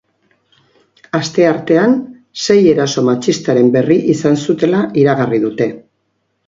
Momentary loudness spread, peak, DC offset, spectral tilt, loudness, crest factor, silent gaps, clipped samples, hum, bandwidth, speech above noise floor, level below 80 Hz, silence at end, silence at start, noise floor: 9 LU; 0 dBFS; under 0.1%; -6 dB/octave; -13 LUFS; 14 dB; none; under 0.1%; none; 7.8 kHz; 54 dB; -56 dBFS; 0.65 s; 1.15 s; -66 dBFS